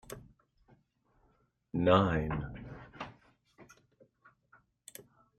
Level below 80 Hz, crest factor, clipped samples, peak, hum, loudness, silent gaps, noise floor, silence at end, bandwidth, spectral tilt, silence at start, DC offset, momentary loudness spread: -56 dBFS; 26 dB; under 0.1%; -10 dBFS; none; -31 LUFS; none; -72 dBFS; 0.35 s; 15 kHz; -7 dB/octave; 0.1 s; under 0.1%; 25 LU